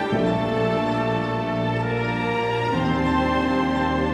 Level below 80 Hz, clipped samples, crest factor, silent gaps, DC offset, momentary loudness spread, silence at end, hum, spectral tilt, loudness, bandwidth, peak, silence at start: -40 dBFS; under 0.1%; 12 dB; none; under 0.1%; 3 LU; 0 s; none; -7 dB/octave; -22 LUFS; 11 kHz; -10 dBFS; 0 s